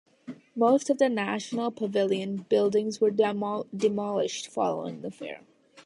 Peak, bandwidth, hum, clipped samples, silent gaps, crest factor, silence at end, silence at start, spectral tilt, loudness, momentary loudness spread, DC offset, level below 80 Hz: -10 dBFS; 11.5 kHz; none; under 0.1%; none; 18 dB; 0.05 s; 0.25 s; -5 dB/octave; -27 LUFS; 16 LU; under 0.1%; -74 dBFS